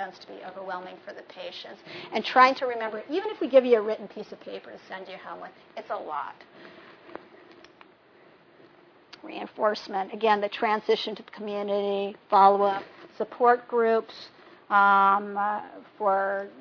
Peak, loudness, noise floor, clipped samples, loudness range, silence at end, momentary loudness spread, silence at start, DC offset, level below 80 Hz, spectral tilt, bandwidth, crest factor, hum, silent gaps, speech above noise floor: -4 dBFS; -25 LUFS; -56 dBFS; under 0.1%; 16 LU; 0 s; 22 LU; 0 s; under 0.1%; -80 dBFS; -5.5 dB/octave; 5.4 kHz; 22 dB; none; none; 30 dB